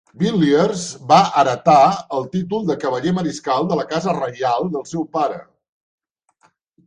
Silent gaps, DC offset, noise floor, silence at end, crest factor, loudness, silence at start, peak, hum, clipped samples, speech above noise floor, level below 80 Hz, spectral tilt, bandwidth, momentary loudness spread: none; under 0.1%; -60 dBFS; 1.45 s; 18 dB; -18 LUFS; 0.15 s; 0 dBFS; none; under 0.1%; 43 dB; -58 dBFS; -5.5 dB/octave; 10.5 kHz; 11 LU